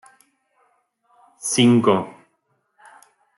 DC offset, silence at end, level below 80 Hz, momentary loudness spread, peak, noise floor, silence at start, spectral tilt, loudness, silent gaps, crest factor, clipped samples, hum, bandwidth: under 0.1%; 1.25 s; -70 dBFS; 16 LU; -4 dBFS; -69 dBFS; 1.45 s; -4.5 dB/octave; -18 LUFS; none; 18 dB; under 0.1%; none; 12 kHz